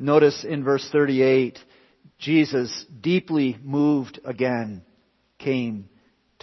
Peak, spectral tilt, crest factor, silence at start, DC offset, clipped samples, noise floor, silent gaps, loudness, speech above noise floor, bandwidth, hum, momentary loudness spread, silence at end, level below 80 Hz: -4 dBFS; -6.5 dB/octave; 20 dB; 0 s; under 0.1%; under 0.1%; -64 dBFS; none; -22 LUFS; 42 dB; 6.2 kHz; none; 13 LU; 0.6 s; -68 dBFS